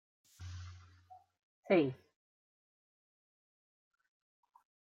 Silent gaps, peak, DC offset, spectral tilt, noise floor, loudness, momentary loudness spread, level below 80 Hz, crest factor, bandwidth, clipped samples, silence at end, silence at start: 1.43-1.63 s; -18 dBFS; under 0.1%; -7 dB/octave; -62 dBFS; -33 LUFS; 22 LU; -78 dBFS; 24 dB; 8.2 kHz; under 0.1%; 3.05 s; 0.4 s